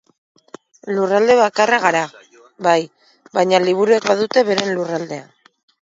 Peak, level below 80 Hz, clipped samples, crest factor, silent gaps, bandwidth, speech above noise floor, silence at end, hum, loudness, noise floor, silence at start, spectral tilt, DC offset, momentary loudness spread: 0 dBFS; -66 dBFS; under 0.1%; 18 dB; none; 7.8 kHz; 27 dB; 0.65 s; none; -16 LUFS; -42 dBFS; 0.85 s; -4 dB/octave; under 0.1%; 14 LU